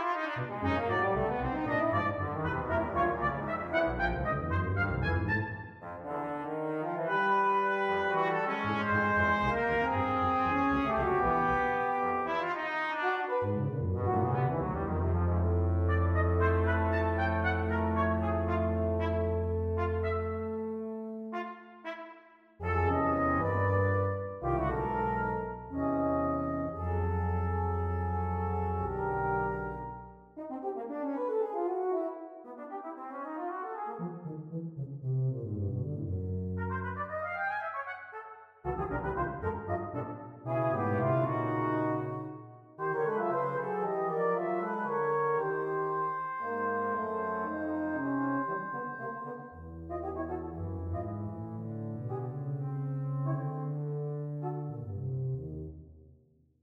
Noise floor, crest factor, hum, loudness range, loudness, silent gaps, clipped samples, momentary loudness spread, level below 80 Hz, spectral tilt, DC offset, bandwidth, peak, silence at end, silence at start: -64 dBFS; 16 dB; none; 7 LU; -32 LUFS; none; under 0.1%; 11 LU; -48 dBFS; -9 dB/octave; under 0.1%; 6 kHz; -16 dBFS; 0.6 s; 0 s